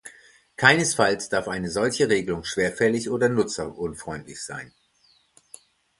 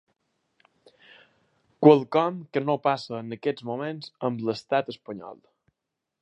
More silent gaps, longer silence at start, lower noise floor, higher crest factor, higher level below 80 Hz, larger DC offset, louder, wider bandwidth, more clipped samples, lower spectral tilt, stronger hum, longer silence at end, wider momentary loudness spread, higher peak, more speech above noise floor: neither; second, 0.05 s vs 1.8 s; second, -63 dBFS vs -84 dBFS; about the same, 24 dB vs 26 dB; first, -54 dBFS vs -76 dBFS; neither; about the same, -23 LUFS vs -25 LUFS; first, 11.5 kHz vs 8.4 kHz; neither; second, -4 dB/octave vs -7.5 dB/octave; neither; first, 1.3 s vs 0.85 s; about the same, 17 LU vs 19 LU; about the same, 0 dBFS vs -2 dBFS; second, 39 dB vs 59 dB